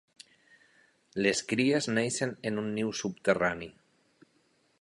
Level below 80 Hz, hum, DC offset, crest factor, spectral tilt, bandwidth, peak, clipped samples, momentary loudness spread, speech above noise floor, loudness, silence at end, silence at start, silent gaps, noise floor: -66 dBFS; none; under 0.1%; 22 dB; -4 dB/octave; 11.5 kHz; -10 dBFS; under 0.1%; 8 LU; 40 dB; -30 LUFS; 1.1 s; 1.15 s; none; -70 dBFS